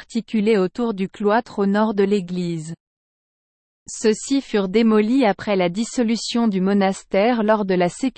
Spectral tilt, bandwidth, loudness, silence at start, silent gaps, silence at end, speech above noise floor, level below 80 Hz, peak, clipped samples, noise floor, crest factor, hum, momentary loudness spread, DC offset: -5.5 dB/octave; 8.8 kHz; -20 LUFS; 0 s; 2.80-3.86 s; 0.05 s; over 71 dB; -56 dBFS; -4 dBFS; under 0.1%; under -90 dBFS; 16 dB; none; 7 LU; under 0.1%